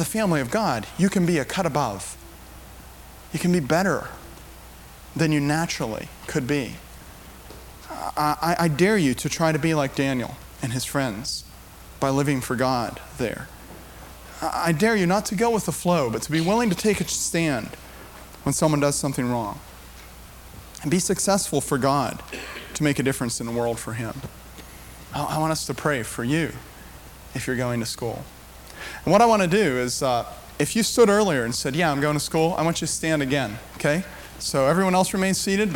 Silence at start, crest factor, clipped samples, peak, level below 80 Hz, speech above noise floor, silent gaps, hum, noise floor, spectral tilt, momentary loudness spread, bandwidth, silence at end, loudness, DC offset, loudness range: 0 s; 18 dB; under 0.1%; -6 dBFS; -46 dBFS; 21 dB; none; none; -44 dBFS; -4.5 dB/octave; 22 LU; 18.5 kHz; 0 s; -23 LUFS; under 0.1%; 6 LU